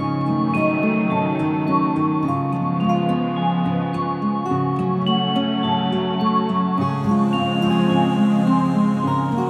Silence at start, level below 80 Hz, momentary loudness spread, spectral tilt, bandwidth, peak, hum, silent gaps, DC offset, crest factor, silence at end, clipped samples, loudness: 0 s; -58 dBFS; 4 LU; -8 dB/octave; 9.4 kHz; -6 dBFS; none; none; under 0.1%; 12 dB; 0 s; under 0.1%; -20 LUFS